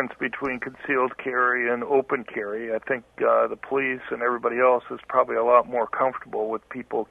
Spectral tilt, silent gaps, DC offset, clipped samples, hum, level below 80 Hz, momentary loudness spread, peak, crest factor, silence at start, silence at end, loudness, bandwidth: -7.5 dB/octave; none; under 0.1%; under 0.1%; none; -64 dBFS; 10 LU; -4 dBFS; 20 dB; 0 s; 0.05 s; -24 LUFS; 3.8 kHz